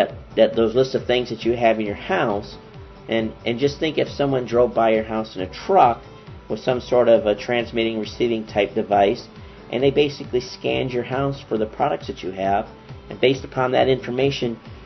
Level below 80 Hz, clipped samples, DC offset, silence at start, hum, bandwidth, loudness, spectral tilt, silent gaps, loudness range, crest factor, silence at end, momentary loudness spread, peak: -48 dBFS; under 0.1%; under 0.1%; 0 s; none; 6.2 kHz; -21 LUFS; -6.5 dB/octave; none; 3 LU; 18 dB; 0 s; 12 LU; -2 dBFS